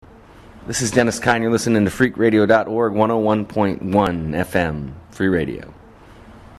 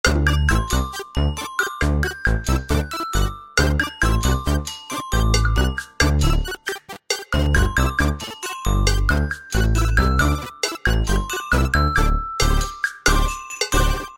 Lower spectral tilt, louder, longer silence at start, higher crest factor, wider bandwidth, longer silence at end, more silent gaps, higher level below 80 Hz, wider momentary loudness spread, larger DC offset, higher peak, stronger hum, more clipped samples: about the same, -5.5 dB/octave vs -4.5 dB/octave; first, -18 LUFS vs -21 LUFS; first, 0.55 s vs 0.05 s; about the same, 20 dB vs 18 dB; second, 13.5 kHz vs 16.5 kHz; about the same, 0.05 s vs 0 s; neither; second, -44 dBFS vs -22 dBFS; first, 10 LU vs 7 LU; second, under 0.1% vs 0.2%; about the same, 0 dBFS vs -2 dBFS; neither; neither